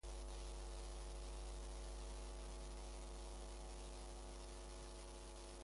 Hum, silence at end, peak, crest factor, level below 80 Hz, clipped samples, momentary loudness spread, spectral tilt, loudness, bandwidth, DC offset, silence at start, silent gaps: none; 0 s; -40 dBFS; 10 dB; -52 dBFS; under 0.1%; 2 LU; -4 dB/octave; -54 LUFS; 11.5 kHz; under 0.1%; 0.05 s; none